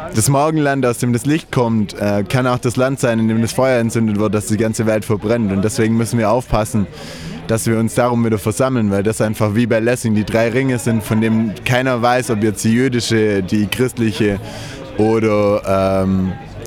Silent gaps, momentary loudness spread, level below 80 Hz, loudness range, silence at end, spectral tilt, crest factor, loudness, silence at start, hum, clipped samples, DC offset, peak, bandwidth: none; 4 LU; -40 dBFS; 1 LU; 0 s; -6 dB/octave; 16 dB; -16 LUFS; 0 s; none; under 0.1%; under 0.1%; 0 dBFS; 17.5 kHz